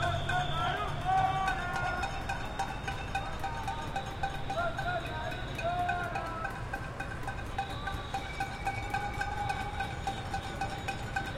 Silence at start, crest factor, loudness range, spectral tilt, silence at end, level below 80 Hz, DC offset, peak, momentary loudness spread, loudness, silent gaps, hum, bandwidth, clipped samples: 0 s; 18 dB; 3 LU; -5 dB/octave; 0 s; -44 dBFS; under 0.1%; -16 dBFS; 6 LU; -35 LUFS; none; none; 16.5 kHz; under 0.1%